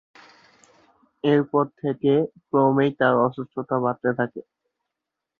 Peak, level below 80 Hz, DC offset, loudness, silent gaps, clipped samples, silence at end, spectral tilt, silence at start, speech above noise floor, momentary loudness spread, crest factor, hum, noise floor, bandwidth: -4 dBFS; -68 dBFS; under 0.1%; -22 LUFS; none; under 0.1%; 1 s; -9 dB/octave; 1.25 s; 63 dB; 8 LU; 20 dB; none; -84 dBFS; 7.2 kHz